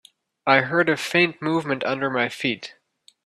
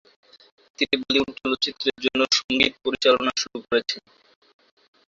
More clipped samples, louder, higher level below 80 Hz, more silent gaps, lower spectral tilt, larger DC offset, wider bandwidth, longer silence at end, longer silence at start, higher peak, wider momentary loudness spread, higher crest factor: neither; about the same, -22 LUFS vs -22 LUFS; second, -66 dBFS vs -58 dBFS; second, none vs 2.44-2.49 s; first, -5 dB/octave vs -2 dB/octave; neither; first, 14 kHz vs 7.8 kHz; second, 0.55 s vs 1.1 s; second, 0.45 s vs 0.8 s; about the same, -2 dBFS vs -2 dBFS; about the same, 9 LU vs 7 LU; about the same, 20 dB vs 24 dB